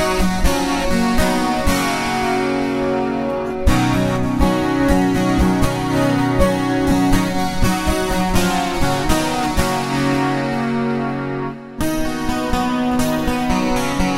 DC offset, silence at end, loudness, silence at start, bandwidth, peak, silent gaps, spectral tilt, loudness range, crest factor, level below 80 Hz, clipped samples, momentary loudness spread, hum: 0.6%; 0 s; -18 LUFS; 0 s; 16.5 kHz; 0 dBFS; none; -5.5 dB/octave; 3 LU; 16 dB; -26 dBFS; under 0.1%; 5 LU; none